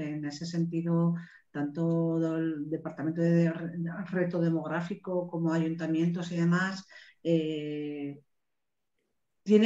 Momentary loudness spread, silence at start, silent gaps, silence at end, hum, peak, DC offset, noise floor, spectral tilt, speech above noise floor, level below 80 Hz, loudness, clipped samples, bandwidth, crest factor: 9 LU; 0 s; none; 0 s; none; -10 dBFS; under 0.1%; -88 dBFS; -8 dB/octave; 58 dB; -78 dBFS; -31 LUFS; under 0.1%; 7.8 kHz; 20 dB